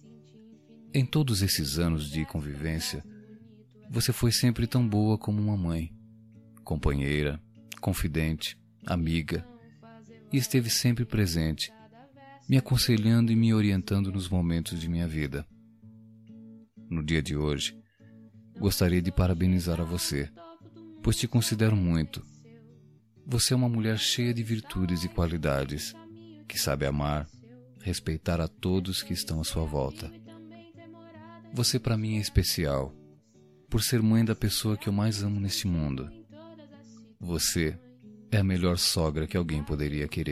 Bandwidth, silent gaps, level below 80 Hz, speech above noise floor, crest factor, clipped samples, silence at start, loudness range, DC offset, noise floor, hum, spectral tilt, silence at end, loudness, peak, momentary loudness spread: 15.5 kHz; none; -42 dBFS; 31 dB; 20 dB; under 0.1%; 0.05 s; 6 LU; under 0.1%; -58 dBFS; none; -5 dB/octave; 0 s; -28 LUFS; -10 dBFS; 15 LU